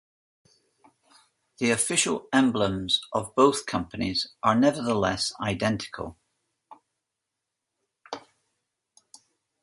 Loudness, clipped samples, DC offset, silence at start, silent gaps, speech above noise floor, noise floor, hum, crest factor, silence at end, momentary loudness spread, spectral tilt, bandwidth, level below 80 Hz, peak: -25 LUFS; under 0.1%; under 0.1%; 1.6 s; none; 59 dB; -84 dBFS; none; 24 dB; 1.45 s; 16 LU; -3.5 dB/octave; 12 kHz; -56 dBFS; -4 dBFS